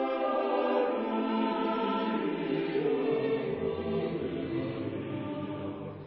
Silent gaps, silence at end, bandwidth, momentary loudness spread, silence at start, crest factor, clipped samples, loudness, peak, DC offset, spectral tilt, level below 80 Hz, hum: none; 0 s; 5.6 kHz; 7 LU; 0 s; 14 dB; under 0.1%; -31 LUFS; -18 dBFS; under 0.1%; -5 dB/octave; -60 dBFS; none